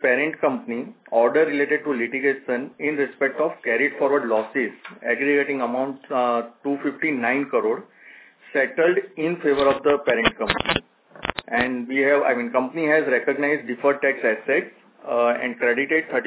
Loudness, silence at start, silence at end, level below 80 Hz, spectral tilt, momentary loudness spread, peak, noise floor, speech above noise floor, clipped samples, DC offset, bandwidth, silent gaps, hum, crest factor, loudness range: -22 LUFS; 0 s; 0 s; -54 dBFS; -8.5 dB/octave; 8 LU; 0 dBFS; -48 dBFS; 26 dB; under 0.1%; under 0.1%; 4 kHz; none; none; 22 dB; 2 LU